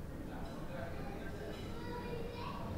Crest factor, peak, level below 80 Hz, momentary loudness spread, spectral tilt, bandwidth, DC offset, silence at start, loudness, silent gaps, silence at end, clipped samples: 12 dB; -30 dBFS; -50 dBFS; 3 LU; -6.5 dB/octave; 16 kHz; under 0.1%; 0 s; -45 LUFS; none; 0 s; under 0.1%